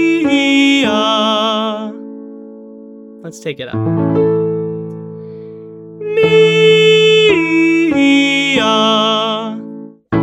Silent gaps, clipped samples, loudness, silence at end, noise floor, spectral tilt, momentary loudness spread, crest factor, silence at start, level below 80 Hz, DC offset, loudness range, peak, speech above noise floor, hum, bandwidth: none; under 0.1%; -12 LUFS; 0 s; -34 dBFS; -5 dB/octave; 23 LU; 14 dB; 0 s; -52 dBFS; under 0.1%; 9 LU; 0 dBFS; 19 dB; none; 11.5 kHz